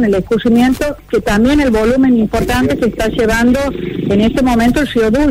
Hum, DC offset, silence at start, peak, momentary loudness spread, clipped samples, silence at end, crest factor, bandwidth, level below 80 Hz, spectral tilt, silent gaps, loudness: none; under 0.1%; 0 s; -2 dBFS; 5 LU; under 0.1%; 0 s; 10 dB; 16 kHz; -28 dBFS; -6 dB/octave; none; -13 LUFS